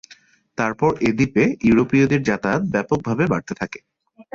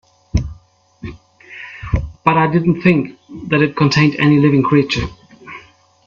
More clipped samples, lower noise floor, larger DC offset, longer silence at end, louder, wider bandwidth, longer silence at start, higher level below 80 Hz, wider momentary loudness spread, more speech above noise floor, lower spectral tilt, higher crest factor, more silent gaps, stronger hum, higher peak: neither; about the same, -51 dBFS vs -48 dBFS; neither; second, 0.1 s vs 0.45 s; second, -19 LUFS vs -15 LUFS; about the same, 7.6 kHz vs 7.6 kHz; first, 0.6 s vs 0.35 s; second, -48 dBFS vs -34 dBFS; second, 13 LU vs 22 LU; about the same, 32 dB vs 35 dB; about the same, -7 dB/octave vs -7 dB/octave; about the same, 14 dB vs 16 dB; neither; neither; second, -6 dBFS vs 0 dBFS